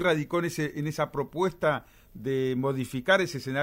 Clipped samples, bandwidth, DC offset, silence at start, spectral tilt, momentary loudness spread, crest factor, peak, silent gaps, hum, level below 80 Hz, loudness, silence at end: under 0.1%; 16 kHz; under 0.1%; 0 s; -5.5 dB/octave; 7 LU; 18 dB; -10 dBFS; none; none; -58 dBFS; -28 LUFS; 0 s